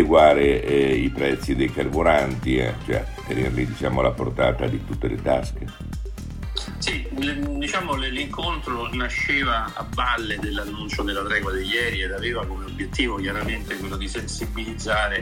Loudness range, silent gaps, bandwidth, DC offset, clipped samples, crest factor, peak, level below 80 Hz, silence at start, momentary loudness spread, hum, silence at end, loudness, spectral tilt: 4 LU; none; 16.5 kHz; under 0.1%; under 0.1%; 22 dB; -2 dBFS; -34 dBFS; 0 s; 10 LU; none; 0 s; -23 LUFS; -5 dB/octave